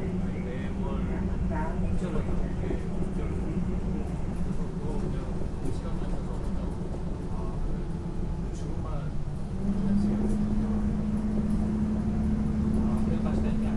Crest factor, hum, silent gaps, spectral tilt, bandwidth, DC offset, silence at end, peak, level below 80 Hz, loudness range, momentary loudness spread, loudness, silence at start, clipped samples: 14 dB; none; none; -8.5 dB/octave; 11.5 kHz; under 0.1%; 0 s; -14 dBFS; -34 dBFS; 6 LU; 7 LU; -31 LUFS; 0 s; under 0.1%